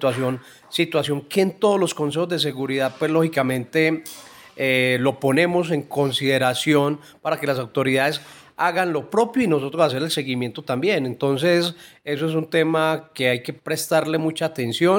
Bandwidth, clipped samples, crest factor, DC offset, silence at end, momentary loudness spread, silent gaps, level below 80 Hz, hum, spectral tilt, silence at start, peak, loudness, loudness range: 17 kHz; under 0.1%; 16 dB; under 0.1%; 0 s; 8 LU; none; -66 dBFS; none; -5 dB/octave; 0 s; -4 dBFS; -21 LUFS; 2 LU